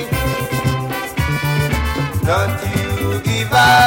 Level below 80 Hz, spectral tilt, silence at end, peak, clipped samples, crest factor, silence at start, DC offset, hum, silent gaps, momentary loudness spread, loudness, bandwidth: -30 dBFS; -4.5 dB/octave; 0 s; -2 dBFS; under 0.1%; 14 dB; 0 s; under 0.1%; none; none; 5 LU; -18 LUFS; 17 kHz